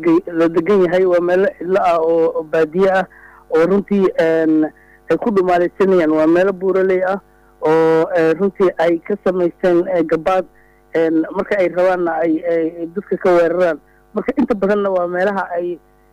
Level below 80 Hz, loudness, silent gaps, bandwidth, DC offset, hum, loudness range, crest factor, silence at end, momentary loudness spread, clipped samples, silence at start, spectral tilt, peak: -52 dBFS; -16 LUFS; none; 10 kHz; under 0.1%; none; 2 LU; 8 dB; 0.35 s; 8 LU; under 0.1%; 0 s; -7.5 dB/octave; -8 dBFS